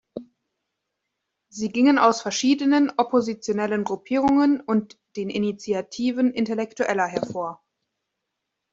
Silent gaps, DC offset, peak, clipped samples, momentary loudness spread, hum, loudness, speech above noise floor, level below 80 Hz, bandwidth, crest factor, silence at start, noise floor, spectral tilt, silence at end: none; under 0.1%; -4 dBFS; under 0.1%; 12 LU; none; -23 LUFS; 59 dB; -64 dBFS; 7.8 kHz; 20 dB; 0.15 s; -81 dBFS; -4.5 dB/octave; 1.2 s